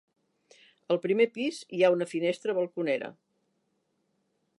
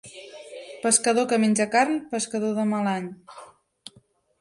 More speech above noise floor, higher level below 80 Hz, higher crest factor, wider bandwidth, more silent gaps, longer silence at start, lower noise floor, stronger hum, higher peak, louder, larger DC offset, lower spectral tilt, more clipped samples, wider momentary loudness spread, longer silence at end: first, 48 dB vs 37 dB; second, -88 dBFS vs -72 dBFS; about the same, 20 dB vs 22 dB; about the same, 11.5 kHz vs 11.5 kHz; neither; first, 0.9 s vs 0.05 s; first, -76 dBFS vs -60 dBFS; neither; second, -10 dBFS vs -4 dBFS; second, -28 LUFS vs -23 LUFS; neither; first, -5.5 dB/octave vs -3.5 dB/octave; neither; second, 8 LU vs 21 LU; first, 1.5 s vs 0.95 s